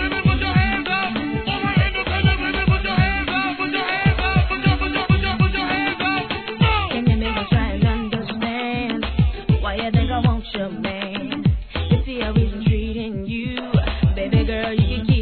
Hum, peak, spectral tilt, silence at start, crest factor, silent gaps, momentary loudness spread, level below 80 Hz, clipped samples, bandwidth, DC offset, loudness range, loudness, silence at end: none; -4 dBFS; -9.5 dB/octave; 0 s; 16 dB; none; 7 LU; -28 dBFS; under 0.1%; 4.6 kHz; 0.2%; 3 LU; -20 LUFS; 0 s